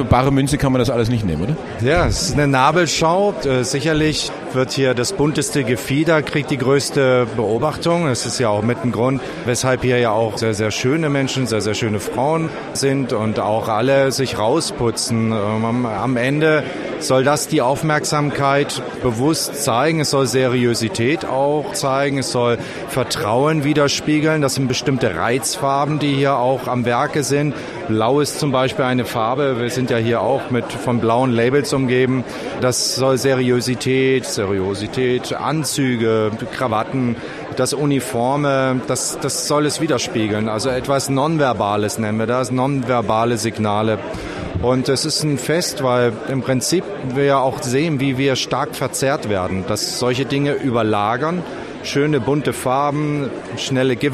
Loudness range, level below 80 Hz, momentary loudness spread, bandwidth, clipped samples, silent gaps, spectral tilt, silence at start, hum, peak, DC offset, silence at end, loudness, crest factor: 2 LU; -42 dBFS; 5 LU; 15 kHz; under 0.1%; none; -5 dB/octave; 0 s; none; 0 dBFS; under 0.1%; 0 s; -18 LUFS; 18 dB